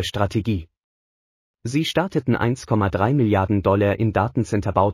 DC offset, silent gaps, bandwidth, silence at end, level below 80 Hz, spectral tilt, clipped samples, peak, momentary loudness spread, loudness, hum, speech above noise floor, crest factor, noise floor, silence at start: under 0.1%; 0.84-1.54 s; 14 kHz; 0 s; -44 dBFS; -7 dB/octave; under 0.1%; -4 dBFS; 6 LU; -21 LUFS; none; over 70 dB; 18 dB; under -90 dBFS; 0 s